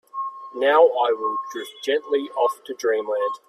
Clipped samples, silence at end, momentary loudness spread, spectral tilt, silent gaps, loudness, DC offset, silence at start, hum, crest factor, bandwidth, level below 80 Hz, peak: under 0.1%; 0.1 s; 15 LU; -2 dB/octave; none; -22 LUFS; under 0.1%; 0.15 s; none; 18 dB; 14 kHz; -78 dBFS; -4 dBFS